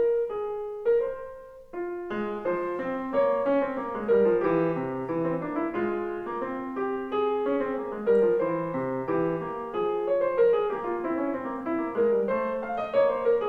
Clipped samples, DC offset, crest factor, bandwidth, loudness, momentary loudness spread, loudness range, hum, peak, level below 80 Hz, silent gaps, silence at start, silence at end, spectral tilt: under 0.1%; under 0.1%; 14 dB; 4.6 kHz; -27 LUFS; 9 LU; 3 LU; none; -12 dBFS; -58 dBFS; none; 0 s; 0 s; -9 dB/octave